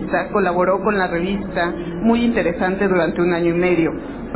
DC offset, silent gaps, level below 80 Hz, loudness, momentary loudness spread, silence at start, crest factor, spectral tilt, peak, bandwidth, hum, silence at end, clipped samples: under 0.1%; none; -40 dBFS; -18 LUFS; 5 LU; 0 s; 14 dB; -11 dB/octave; -4 dBFS; 4 kHz; none; 0 s; under 0.1%